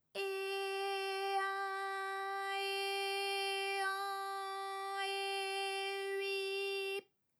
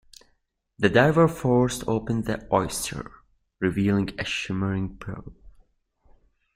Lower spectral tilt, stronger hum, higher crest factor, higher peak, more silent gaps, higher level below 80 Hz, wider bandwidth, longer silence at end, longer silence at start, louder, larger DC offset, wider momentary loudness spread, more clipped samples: second, 0.5 dB/octave vs -5.5 dB/octave; neither; second, 14 dB vs 22 dB; second, -26 dBFS vs -4 dBFS; neither; second, under -90 dBFS vs -48 dBFS; first, over 20 kHz vs 16 kHz; second, 0.35 s vs 1.05 s; second, 0.15 s vs 0.8 s; second, -38 LUFS vs -24 LUFS; neither; second, 5 LU vs 17 LU; neither